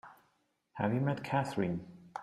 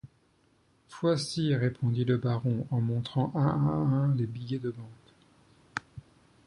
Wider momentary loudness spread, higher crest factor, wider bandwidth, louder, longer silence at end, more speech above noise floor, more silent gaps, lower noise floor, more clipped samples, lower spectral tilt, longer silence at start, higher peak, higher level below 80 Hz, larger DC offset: about the same, 13 LU vs 13 LU; about the same, 18 dB vs 18 dB; first, 12.5 kHz vs 11 kHz; second, -35 LUFS vs -30 LUFS; second, 0 s vs 0.45 s; first, 43 dB vs 39 dB; neither; first, -76 dBFS vs -67 dBFS; neither; about the same, -7.5 dB/octave vs -7.5 dB/octave; about the same, 0.05 s vs 0.05 s; second, -18 dBFS vs -14 dBFS; second, -68 dBFS vs -60 dBFS; neither